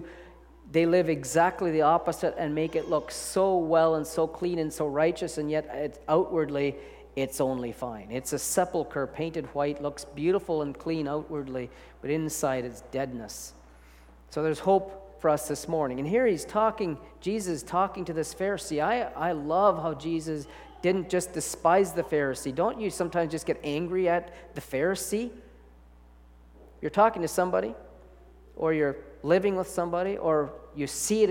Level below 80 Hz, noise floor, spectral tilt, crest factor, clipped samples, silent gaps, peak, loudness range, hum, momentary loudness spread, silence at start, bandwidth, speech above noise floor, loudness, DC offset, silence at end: -54 dBFS; -53 dBFS; -5 dB/octave; 20 dB; under 0.1%; none; -8 dBFS; 4 LU; none; 11 LU; 0 s; 17.5 kHz; 26 dB; -28 LUFS; under 0.1%; 0 s